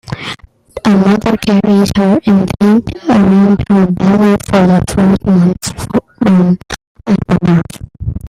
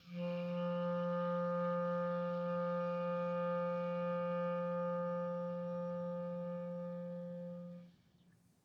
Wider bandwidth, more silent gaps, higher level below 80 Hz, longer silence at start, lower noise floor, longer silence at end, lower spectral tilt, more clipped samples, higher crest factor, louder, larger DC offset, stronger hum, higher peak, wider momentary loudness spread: first, 13.5 kHz vs 6 kHz; first, 6.87-6.95 s vs none; first, -34 dBFS vs -84 dBFS; about the same, 0.1 s vs 0.05 s; second, -30 dBFS vs -69 dBFS; second, 0 s vs 0.75 s; second, -7 dB/octave vs -9.5 dB/octave; neither; about the same, 10 dB vs 12 dB; first, -10 LUFS vs -39 LUFS; neither; neither; first, 0 dBFS vs -28 dBFS; first, 13 LU vs 8 LU